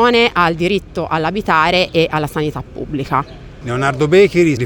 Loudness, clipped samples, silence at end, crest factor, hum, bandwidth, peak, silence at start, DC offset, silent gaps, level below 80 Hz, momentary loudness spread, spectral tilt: -15 LUFS; under 0.1%; 0 s; 14 dB; none; 18.5 kHz; 0 dBFS; 0 s; under 0.1%; none; -38 dBFS; 12 LU; -6 dB/octave